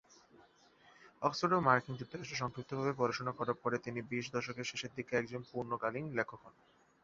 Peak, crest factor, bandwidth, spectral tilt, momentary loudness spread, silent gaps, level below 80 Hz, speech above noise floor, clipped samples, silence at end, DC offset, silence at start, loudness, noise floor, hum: -12 dBFS; 26 dB; 7.6 kHz; -4 dB/octave; 11 LU; none; -72 dBFS; 28 dB; under 0.1%; 0.55 s; under 0.1%; 0.4 s; -37 LUFS; -65 dBFS; none